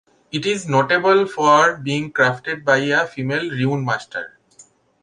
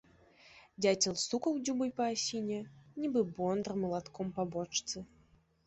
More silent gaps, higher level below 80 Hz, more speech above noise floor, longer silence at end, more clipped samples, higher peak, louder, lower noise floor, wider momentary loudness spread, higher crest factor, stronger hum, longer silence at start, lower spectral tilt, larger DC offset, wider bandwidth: neither; first, -62 dBFS vs -70 dBFS; about the same, 33 dB vs 33 dB; second, 0.4 s vs 0.6 s; neither; first, -2 dBFS vs -14 dBFS; first, -18 LUFS vs -35 LUFS; second, -51 dBFS vs -67 dBFS; about the same, 10 LU vs 11 LU; about the same, 18 dB vs 22 dB; neither; about the same, 0.35 s vs 0.45 s; about the same, -5 dB/octave vs -4 dB/octave; neither; first, 10.5 kHz vs 8.2 kHz